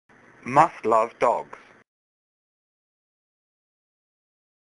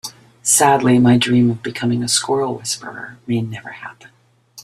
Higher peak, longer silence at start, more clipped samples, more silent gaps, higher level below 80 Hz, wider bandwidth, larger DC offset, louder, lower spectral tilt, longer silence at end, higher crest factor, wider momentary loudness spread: second, -4 dBFS vs 0 dBFS; first, 0.45 s vs 0.05 s; neither; neither; second, -68 dBFS vs -56 dBFS; second, 11.5 kHz vs 14 kHz; neither; second, -22 LUFS vs -16 LUFS; first, -6 dB/octave vs -4 dB/octave; first, 3.35 s vs 0 s; first, 24 dB vs 18 dB; second, 17 LU vs 20 LU